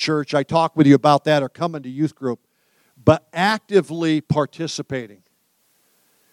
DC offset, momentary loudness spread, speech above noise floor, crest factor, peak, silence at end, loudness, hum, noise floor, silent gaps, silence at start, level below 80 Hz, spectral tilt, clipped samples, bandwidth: under 0.1%; 14 LU; 46 dB; 20 dB; 0 dBFS; 1.25 s; -19 LUFS; none; -65 dBFS; none; 0 s; -56 dBFS; -6 dB/octave; under 0.1%; 12.5 kHz